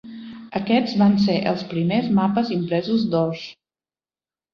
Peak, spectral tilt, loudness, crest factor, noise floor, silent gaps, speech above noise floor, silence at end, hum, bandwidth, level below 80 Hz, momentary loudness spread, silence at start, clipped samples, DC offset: -6 dBFS; -8 dB/octave; -21 LUFS; 16 dB; under -90 dBFS; none; over 70 dB; 1 s; none; 6.6 kHz; -60 dBFS; 15 LU; 0.05 s; under 0.1%; under 0.1%